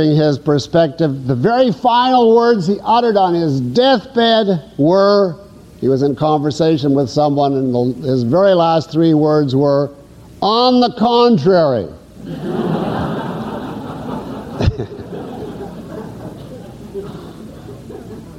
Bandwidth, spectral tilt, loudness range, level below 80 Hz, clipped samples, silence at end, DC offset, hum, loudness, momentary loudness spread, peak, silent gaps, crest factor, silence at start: 12.5 kHz; -7 dB/octave; 12 LU; -40 dBFS; under 0.1%; 0 s; under 0.1%; none; -14 LUFS; 19 LU; -2 dBFS; none; 12 dB; 0 s